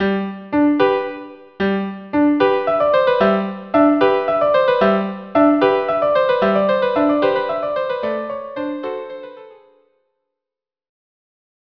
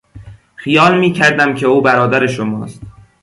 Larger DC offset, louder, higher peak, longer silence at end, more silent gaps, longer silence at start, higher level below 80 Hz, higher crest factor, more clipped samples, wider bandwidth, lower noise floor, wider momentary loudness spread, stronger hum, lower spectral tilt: neither; second, -17 LUFS vs -12 LUFS; about the same, 0 dBFS vs 0 dBFS; first, 2.15 s vs 0.35 s; neither; second, 0 s vs 0.15 s; second, -54 dBFS vs -48 dBFS; about the same, 18 dB vs 14 dB; neither; second, 5.4 kHz vs 11.5 kHz; first, -87 dBFS vs -36 dBFS; about the same, 11 LU vs 13 LU; neither; first, -8.5 dB/octave vs -5.5 dB/octave